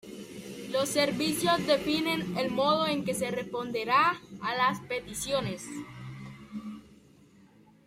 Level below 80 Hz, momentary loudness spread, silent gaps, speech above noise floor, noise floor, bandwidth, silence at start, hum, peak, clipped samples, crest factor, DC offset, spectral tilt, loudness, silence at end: -62 dBFS; 17 LU; none; 29 dB; -58 dBFS; 16 kHz; 0.05 s; none; -12 dBFS; under 0.1%; 20 dB; under 0.1%; -4 dB/octave; -29 LUFS; 0.9 s